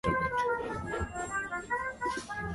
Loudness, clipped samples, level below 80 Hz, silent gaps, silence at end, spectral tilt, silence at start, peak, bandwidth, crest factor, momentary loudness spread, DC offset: -34 LUFS; under 0.1%; -48 dBFS; none; 0 s; -5 dB/octave; 0.05 s; -16 dBFS; 11.5 kHz; 16 dB; 6 LU; under 0.1%